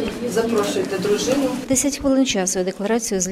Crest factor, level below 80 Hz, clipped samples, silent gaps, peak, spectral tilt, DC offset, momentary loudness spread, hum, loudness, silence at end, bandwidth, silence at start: 14 dB; -46 dBFS; under 0.1%; none; -6 dBFS; -3.5 dB/octave; under 0.1%; 4 LU; none; -20 LUFS; 0 s; 16 kHz; 0 s